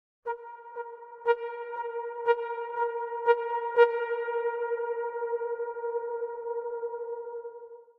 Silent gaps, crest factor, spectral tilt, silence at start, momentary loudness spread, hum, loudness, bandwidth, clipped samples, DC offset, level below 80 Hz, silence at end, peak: none; 24 dB; -3 dB/octave; 0.25 s; 15 LU; none; -31 LUFS; 4.5 kHz; under 0.1%; under 0.1%; -80 dBFS; 0.15 s; -6 dBFS